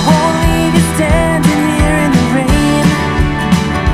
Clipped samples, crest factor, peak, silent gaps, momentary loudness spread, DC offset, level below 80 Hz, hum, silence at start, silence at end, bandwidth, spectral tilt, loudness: under 0.1%; 10 dB; 0 dBFS; none; 2 LU; under 0.1%; -20 dBFS; none; 0 s; 0 s; 15 kHz; -5.5 dB/octave; -11 LUFS